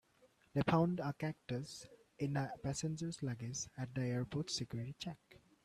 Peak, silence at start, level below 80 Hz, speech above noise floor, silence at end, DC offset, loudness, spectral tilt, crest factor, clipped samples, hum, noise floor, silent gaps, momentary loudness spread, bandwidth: -20 dBFS; 0.55 s; -68 dBFS; 32 dB; 0.25 s; under 0.1%; -41 LUFS; -5.5 dB/octave; 20 dB; under 0.1%; none; -71 dBFS; none; 13 LU; 13.5 kHz